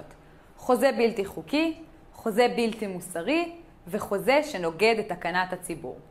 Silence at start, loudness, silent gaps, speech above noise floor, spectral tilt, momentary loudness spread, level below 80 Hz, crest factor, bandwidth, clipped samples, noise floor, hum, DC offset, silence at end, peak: 0 s; -27 LUFS; none; 25 dB; -4.5 dB/octave; 12 LU; -56 dBFS; 18 dB; 16 kHz; under 0.1%; -51 dBFS; none; under 0.1%; 0.05 s; -10 dBFS